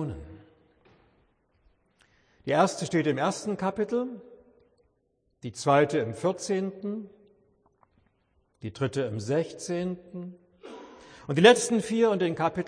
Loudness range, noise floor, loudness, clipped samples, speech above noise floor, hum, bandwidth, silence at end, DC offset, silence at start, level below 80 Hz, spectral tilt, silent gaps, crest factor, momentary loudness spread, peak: 8 LU; -73 dBFS; -26 LUFS; under 0.1%; 47 dB; none; 10.5 kHz; 0 s; under 0.1%; 0 s; -62 dBFS; -5 dB/octave; none; 24 dB; 22 LU; -4 dBFS